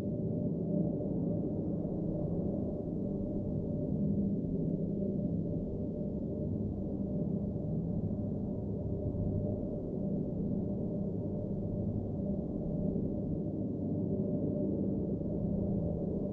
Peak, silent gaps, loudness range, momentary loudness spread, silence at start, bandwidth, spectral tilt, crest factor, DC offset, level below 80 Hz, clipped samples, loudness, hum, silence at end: -20 dBFS; none; 1 LU; 3 LU; 0 s; 1.6 kHz; -14 dB/octave; 14 dB; under 0.1%; -48 dBFS; under 0.1%; -35 LUFS; none; 0 s